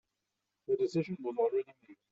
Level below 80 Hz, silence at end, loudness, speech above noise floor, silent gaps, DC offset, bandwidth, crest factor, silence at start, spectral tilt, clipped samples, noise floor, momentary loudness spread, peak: -80 dBFS; 0.2 s; -34 LUFS; 52 dB; none; under 0.1%; 7.8 kHz; 14 dB; 0.7 s; -7 dB/octave; under 0.1%; -86 dBFS; 13 LU; -20 dBFS